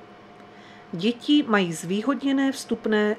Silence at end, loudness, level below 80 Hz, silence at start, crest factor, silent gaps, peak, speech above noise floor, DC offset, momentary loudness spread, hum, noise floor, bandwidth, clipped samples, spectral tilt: 0 s; -24 LUFS; -68 dBFS; 0 s; 18 dB; none; -6 dBFS; 24 dB; under 0.1%; 7 LU; none; -47 dBFS; 13.5 kHz; under 0.1%; -5 dB/octave